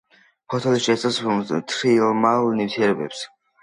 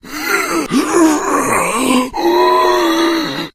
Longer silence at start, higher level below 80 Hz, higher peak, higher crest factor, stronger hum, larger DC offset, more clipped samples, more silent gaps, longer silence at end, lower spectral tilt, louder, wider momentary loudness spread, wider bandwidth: first, 0.5 s vs 0.05 s; second, -66 dBFS vs -42 dBFS; second, -4 dBFS vs 0 dBFS; about the same, 18 dB vs 14 dB; neither; neither; neither; neither; first, 0.35 s vs 0.05 s; first, -5 dB/octave vs -3 dB/octave; second, -21 LUFS vs -13 LUFS; first, 11 LU vs 4 LU; second, 11 kHz vs 15.5 kHz